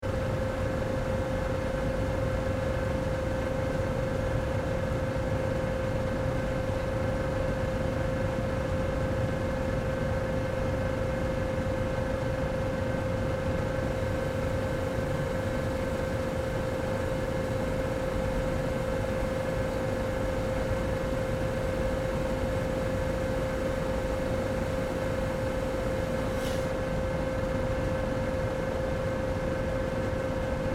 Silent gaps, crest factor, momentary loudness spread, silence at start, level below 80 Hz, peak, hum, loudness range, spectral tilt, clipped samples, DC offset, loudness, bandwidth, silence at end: none; 14 dB; 1 LU; 0 s; -38 dBFS; -16 dBFS; none; 0 LU; -7 dB/octave; under 0.1%; under 0.1%; -30 LUFS; 16 kHz; 0 s